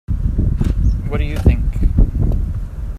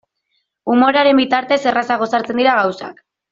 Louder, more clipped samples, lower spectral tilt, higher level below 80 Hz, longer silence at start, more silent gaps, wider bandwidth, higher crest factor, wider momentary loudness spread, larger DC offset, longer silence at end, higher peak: second, -19 LUFS vs -15 LUFS; neither; first, -9 dB/octave vs -4.5 dB/octave; first, -16 dBFS vs -60 dBFS; second, 0.1 s vs 0.65 s; neither; about the same, 7 kHz vs 7.4 kHz; about the same, 14 dB vs 14 dB; second, 5 LU vs 12 LU; neither; second, 0 s vs 0.4 s; about the same, 0 dBFS vs -2 dBFS